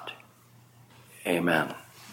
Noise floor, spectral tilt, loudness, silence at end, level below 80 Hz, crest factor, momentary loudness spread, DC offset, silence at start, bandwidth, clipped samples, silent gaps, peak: -57 dBFS; -5 dB/octave; -28 LUFS; 0 s; -70 dBFS; 24 dB; 19 LU; under 0.1%; 0 s; 17 kHz; under 0.1%; none; -8 dBFS